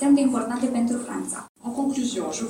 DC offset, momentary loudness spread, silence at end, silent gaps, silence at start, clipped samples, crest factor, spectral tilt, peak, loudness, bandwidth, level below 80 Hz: under 0.1%; 12 LU; 0 s; 1.49-1.55 s; 0 s; under 0.1%; 14 dB; -4 dB/octave; -10 dBFS; -25 LUFS; 13 kHz; -64 dBFS